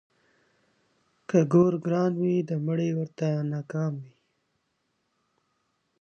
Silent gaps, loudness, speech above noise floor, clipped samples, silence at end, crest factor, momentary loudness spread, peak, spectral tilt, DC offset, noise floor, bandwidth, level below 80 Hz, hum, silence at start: none; -26 LUFS; 51 dB; under 0.1%; 1.95 s; 18 dB; 9 LU; -10 dBFS; -8.5 dB/octave; under 0.1%; -76 dBFS; 7 kHz; -72 dBFS; none; 1.3 s